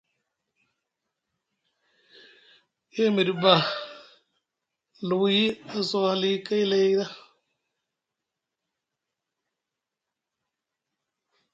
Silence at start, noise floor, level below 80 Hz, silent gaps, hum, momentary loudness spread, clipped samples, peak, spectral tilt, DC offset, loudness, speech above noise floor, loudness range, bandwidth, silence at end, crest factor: 2.95 s; -87 dBFS; -76 dBFS; none; none; 15 LU; under 0.1%; -4 dBFS; -5.5 dB/octave; under 0.1%; -24 LUFS; 63 dB; 6 LU; 7.8 kHz; 4.35 s; 26 dB